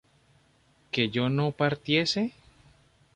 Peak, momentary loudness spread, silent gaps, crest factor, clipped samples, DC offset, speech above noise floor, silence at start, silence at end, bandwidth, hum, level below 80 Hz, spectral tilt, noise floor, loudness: -10 dBFS; 7 LU; none; 20 dB; under 0.1%; under 0.1%; 38 dB; 0.95 s; 0.85 s; 10 kHz; none; -64 dBFS; -5.5 dB/octave; -64 dBFS; -27 LUFS